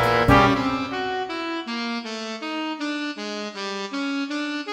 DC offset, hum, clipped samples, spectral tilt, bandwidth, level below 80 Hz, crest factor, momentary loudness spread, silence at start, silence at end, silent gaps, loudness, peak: under 0.1%; none; under 0.1%; -5.5 dB/octave; 16 kHz; -42 dBFS; 22 dB; 13 LU; 0 s; 0 s; none; -24 LUFS; -2 dBFS